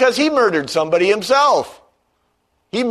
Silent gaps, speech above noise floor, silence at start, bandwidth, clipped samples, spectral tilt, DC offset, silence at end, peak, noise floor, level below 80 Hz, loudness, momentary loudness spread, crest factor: none; 50 dB; 0 s; 13.5 kHz; under 0.1%; -3.5 dB/octave; under 0.1%; 0 s; -2 dBFS; -66 dBFS; -60 dBFS; -16 LUFS; 9 LU; 14 dB